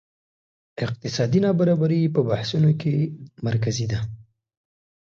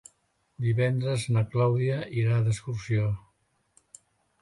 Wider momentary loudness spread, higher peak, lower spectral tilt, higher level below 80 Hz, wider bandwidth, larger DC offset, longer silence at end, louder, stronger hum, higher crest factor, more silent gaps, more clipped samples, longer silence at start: first, 11 LU vs 7 LU; first, -8 dBFS vs -14 dBFS; about the same, -7 dB/octave vs -7 dB/octave; about the same, -54 dBFS vs -56 dBFS; second, 7.6 kHz vs 11.5 kHz; neither; second, 0.9 s vs 1.25 s; first, -23 LUFS vs -27 LUFS; neither; about the same, 16 dB vs 14 dB; neither; neither; first, 0.8 s vs 0.6 s